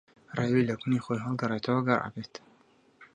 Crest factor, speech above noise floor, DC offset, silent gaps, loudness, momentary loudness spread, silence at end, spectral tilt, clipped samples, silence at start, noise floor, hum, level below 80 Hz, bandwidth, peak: 22 dB; 34 dB; under 0.1%; none; -29 LUFS; 15 LU; 0.1 s; -7.5 dB/octave; under 0.1%; 0.3 s; -63 dBFS; none; -66 dBFS; 9.8 kHz; -10 dBFS